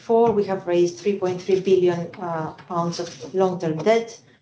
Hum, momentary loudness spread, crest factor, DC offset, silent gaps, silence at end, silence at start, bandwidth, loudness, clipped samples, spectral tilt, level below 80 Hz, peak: none; 10 LU; 16 dB; under 0.1%; none; 0.25 s; 0.1 s; 8 kHz; -22 LUFS; under 0.1%; -6.5 dB/octave; -62 dBFS; -6 dBFS